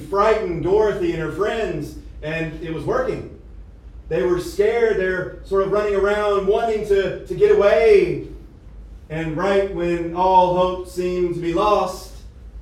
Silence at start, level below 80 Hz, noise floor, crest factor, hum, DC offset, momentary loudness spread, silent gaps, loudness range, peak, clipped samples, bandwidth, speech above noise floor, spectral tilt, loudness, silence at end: 0 s; -38 dBFS; -40 dBFS; 16 dB; none; under 0.1%; 13 LU; none; 6 LU; -4 dBFS; under 0.1%; 13.5 kHz; 21 dB; -6.5 dB/octave; -19 LUFS; 0 s